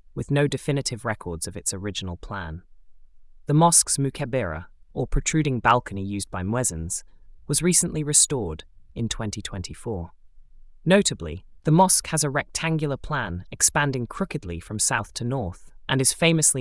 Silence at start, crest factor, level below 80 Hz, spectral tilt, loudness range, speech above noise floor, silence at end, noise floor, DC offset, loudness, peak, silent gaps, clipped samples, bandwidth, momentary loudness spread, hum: 0.15 s; 20 dB; -42 dBFS; -3.5 dB/octave; 4 LU; 23 dB; 0 s; -46 dBFS; under 0.1%; -23 LUFS; -4 dBFS; none; under 0.1%; 12 kHz; 16 LU; none